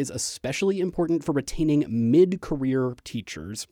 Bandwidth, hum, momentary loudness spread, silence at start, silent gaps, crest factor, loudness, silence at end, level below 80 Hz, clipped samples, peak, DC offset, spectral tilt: 16.5 kHz; none; 14 LU; 0 s; none; 16 dB; -25 LUFS; 0.05 s; -46 dBFS; under 0.1%; -8 dBFS; under 0.1%; -5.5 dB/octave